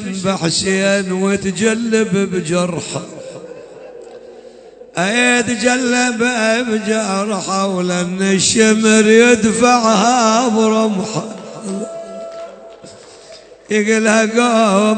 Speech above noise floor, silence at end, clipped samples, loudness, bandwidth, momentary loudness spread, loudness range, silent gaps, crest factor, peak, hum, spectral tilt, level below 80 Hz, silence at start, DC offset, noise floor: 25 dB; 0 s; under 0.1%; -14 LUFS; 9.2 kHz; 18 LU; 9 LU; none; 16 dB; 0 dBFS; none; -4 dB/octave; -54 dBFS; 0 s; under 0.1%; -39 dBFS